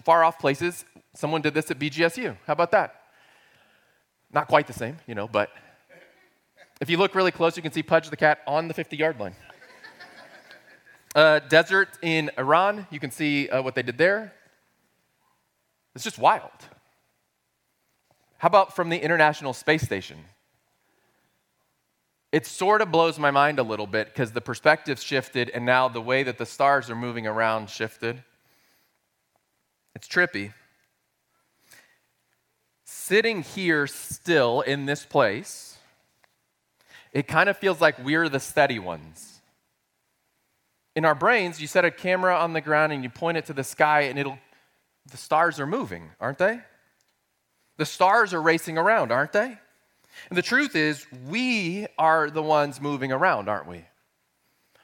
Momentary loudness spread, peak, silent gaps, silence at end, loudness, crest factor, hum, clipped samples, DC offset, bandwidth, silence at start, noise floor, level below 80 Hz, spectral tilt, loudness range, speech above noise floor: 13 LU; -4 dBFS; none; 1.05 s; -23 LUFS; 22 dB; none; under 0.1%; under 0.1%; 17 kHz; 0.05 s; -74 dBFS; -68 dBFS; -4.5 dB/octave; 7 LU; 51 dB